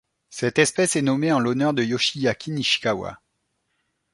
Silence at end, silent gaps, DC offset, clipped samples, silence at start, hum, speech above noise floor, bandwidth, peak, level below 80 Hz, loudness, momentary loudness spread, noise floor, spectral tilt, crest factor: 1 s; none; under 0.1%; under 0.1%; 0.3 s; none; 52 dB; 11.5 kHz; -4 dBFS; -60 dBFS; -22 LUFS; 8 LU; -74 dBFS; -4 dB/octave; 20 dB